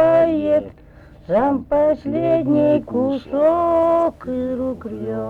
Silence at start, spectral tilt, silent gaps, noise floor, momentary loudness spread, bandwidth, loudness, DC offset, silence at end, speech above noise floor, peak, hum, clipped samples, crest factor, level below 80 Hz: 0 s; -9 dB/octave; none; -44 dBFS; 9 LU; 4.9 kHz; -19 LUFS; under 0.1%; 0 s; 26 dB; -6 dBFS; none; under 0.1%; 12 dB; -46 dBFS